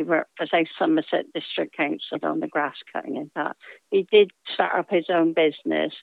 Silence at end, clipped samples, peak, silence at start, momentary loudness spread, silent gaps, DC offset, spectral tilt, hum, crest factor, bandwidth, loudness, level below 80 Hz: 0 s; under 0.1%; -4 dBFS; 0 s; 12 LU; none; under 0.1%; -7 dB/octave; none; 20 dB; 4.7 kHz; -24 LUFS; -88 dBFS